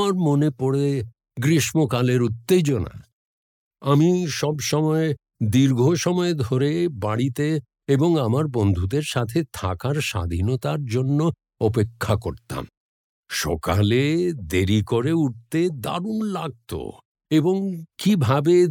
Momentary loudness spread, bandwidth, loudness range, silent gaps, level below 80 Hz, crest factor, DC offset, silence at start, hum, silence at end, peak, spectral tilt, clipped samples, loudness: 9 LU; 18 kHz; 3 LU; 3.13-3.71 s, 12.77-13.23 s, 17.05-17.15 s; -50 dBFS; 16 dB; under 0.1%; 0 s; none; 0 s; -6 dBFS; -6.5 dB/octave; under 0.1%; -22 LUFS